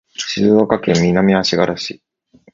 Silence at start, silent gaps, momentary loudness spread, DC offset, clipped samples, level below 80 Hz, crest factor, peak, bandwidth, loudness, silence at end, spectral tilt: 0.2 s; none; 10 LU; under 0.1%; under 0.1%; -46 dBFS; 16 dB; 0 dBFS; 7.6 kHz; -15 LUFS; 0.6 s; -5.5 dB/octave